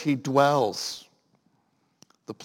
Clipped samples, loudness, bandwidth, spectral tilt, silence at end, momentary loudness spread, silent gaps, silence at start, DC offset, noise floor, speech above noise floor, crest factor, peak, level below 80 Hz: under 0.1%; -24 LUFS; 17 kHz; -5 dB/octave; 0 s; 19 LU; none; 0 s; under 0.1%; -70 dBFS; 46 dB; 22 dB; -6 dBFS; -78 dBFS